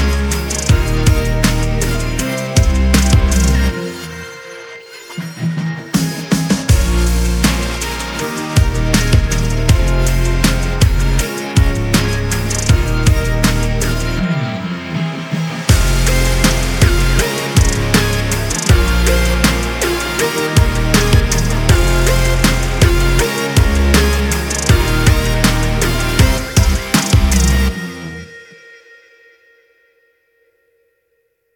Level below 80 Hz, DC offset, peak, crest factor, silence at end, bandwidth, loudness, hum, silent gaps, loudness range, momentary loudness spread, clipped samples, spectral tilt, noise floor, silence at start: -18 dBFS; under 0.1%; 0 dBFS; 14 dB; 3.15 s; 18.5 kHz; -15 LUFS; none; none; 4 LU; 8 LU; under 0.1%; -4.5 dB/octave; -64 dBFS; 0 s